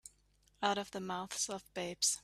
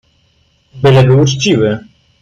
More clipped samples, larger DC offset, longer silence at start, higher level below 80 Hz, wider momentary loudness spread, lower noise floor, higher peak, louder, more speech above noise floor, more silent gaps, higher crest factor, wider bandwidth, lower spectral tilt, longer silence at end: neither; neither; second, 0.05 s vs 0.75 s; second, -72 dBFS vs -44 dBFS; about the same, 9 LU vs 8 LU; first, -71 dBFS vs -55 dBFS; second, -18 dBFS vs 0 dBFS; second, -37 LUFS vs -10 LUFS; second, 33 dB vs 46 dB; neither; first, 22 dB vs 12 dB; first, 15.5 kHz vs 7.6 kHz; second, -1.5 dB/octave vs -6 dB/octave; second, 0.05 s vs 0.4 s